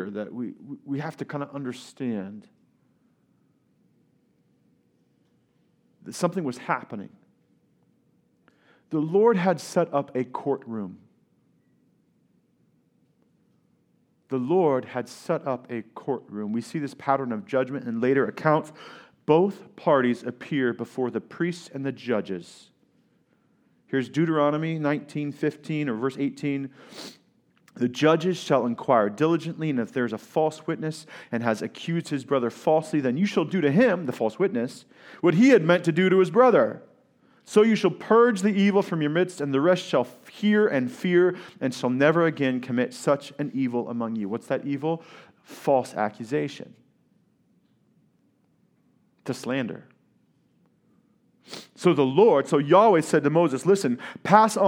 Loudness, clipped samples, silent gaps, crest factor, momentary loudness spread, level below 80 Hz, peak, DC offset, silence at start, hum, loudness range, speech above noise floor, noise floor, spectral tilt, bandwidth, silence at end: -24 LUFS; under 0.1%; none; 24 dB; 15 LU; -80 dBFS; 0 dBFS; under 0.1%; 0 s; none; 15 LU; 43 dB; -67 dBFS; -6.5 dB/octave; 15.5 kHz; 0 s